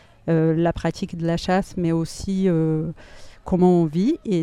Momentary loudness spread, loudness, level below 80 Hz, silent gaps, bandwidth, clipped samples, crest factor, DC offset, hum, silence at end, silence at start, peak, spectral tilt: 9 LU; -22 LUFS; -44 dBFS; none; 11.5 kHz; under 0.1%; 16 dB; under 0.1%; none; 0 s; 0.25 s; -6 dBFS; -7.5 dB/octave